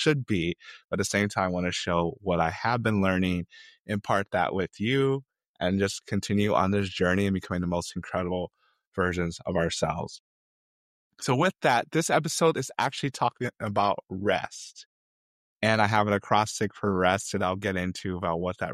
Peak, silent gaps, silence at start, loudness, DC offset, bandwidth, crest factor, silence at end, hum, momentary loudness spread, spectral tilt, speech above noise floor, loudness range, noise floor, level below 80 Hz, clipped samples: -6 dBFS; 0.84-0.89 s, 3.80-3.85 s, 5.46-5.54 s, 8.87-8.92 s, 10.20-11.11 s, 14.86-15.60 s; 0 s; -27 LUFS; under 0.1%; 14 kHz; 22 dB; 0 s; none; 9 LU; -5 dB/octave; over 63 dB; 4 LU; under -90 dBFS; -56 dBFS; under 0.1%